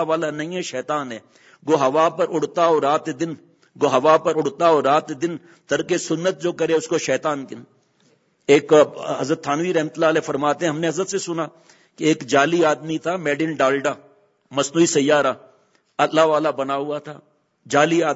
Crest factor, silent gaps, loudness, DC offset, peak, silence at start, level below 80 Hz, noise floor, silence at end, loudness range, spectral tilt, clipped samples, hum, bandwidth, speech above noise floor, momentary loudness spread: 20 dB; none; -20 LUFS; under 0.1%; 0 dBFS; 0 s; -70 dBFS; -61 dBFS; 0 s; 2 LU; -4.5 dB/octave; under 0.1%; none; 8 kHz; 41 dB; 12 LU